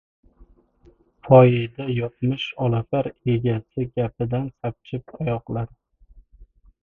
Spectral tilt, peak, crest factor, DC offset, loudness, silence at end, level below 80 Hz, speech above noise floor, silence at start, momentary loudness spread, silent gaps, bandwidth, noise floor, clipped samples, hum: -9.5 dB/octave; 0 dBFS; 22 dB; under 0.1%; -22 LUFS; 0.4 s; -50 dBFS; 35 dB; 1.25 s; 16 LU; none; 3.8 kHz; -56 dBFS; under 0.1%; none